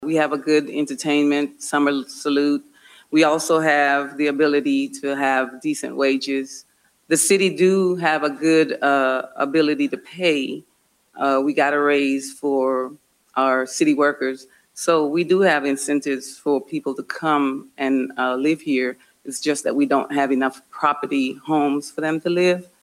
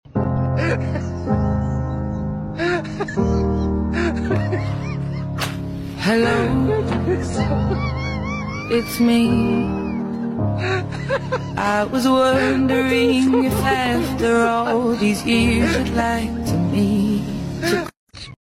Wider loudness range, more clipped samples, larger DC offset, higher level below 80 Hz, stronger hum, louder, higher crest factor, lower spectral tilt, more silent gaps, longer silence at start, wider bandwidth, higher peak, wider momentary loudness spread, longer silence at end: about the same, 3 LU vs 4 LU; neither; neither; second, -72 dBFS vs -34 dBFS; neither; about the same, -20 LUFS vs -20 LUFS; first, 18 dB vs 12 dB; second, -4 dB/octave vs -6.5 dB/octave; second, none vs 17.99-18.07 s; about the same, 0 s vs 0.05 s; about the same, 16 kHz vs 16 kHz; first, -2 dBFS vs -6 dBFS; about the same, 9 LU vs 8 LU; about the same, 0.2 s vs 0.1 s